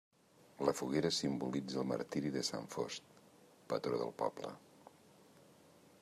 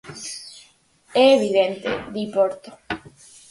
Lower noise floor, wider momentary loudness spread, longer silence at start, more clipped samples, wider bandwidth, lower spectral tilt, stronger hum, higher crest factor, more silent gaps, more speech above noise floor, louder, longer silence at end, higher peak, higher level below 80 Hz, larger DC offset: first, -64 dBFS vs -56 dBFS; second, 9 LU vs 18 LU; first, 0.6 s vs 0.05 s; neither; first, 15 kHz vs 11.5 kHz; about the same, -4.5 dB/octave vs -4 dB/octave; neither; about the same, 22 dB vs 18 dB; neither; second, 26 dB vs 36 dB; second, -39 LUFS vs -20 LUFS; first, 1.4 s vs 0.5 s; second, -20 dBFS vs -4 dBFS; second, -74 dBFS vs -58 dBFS; neither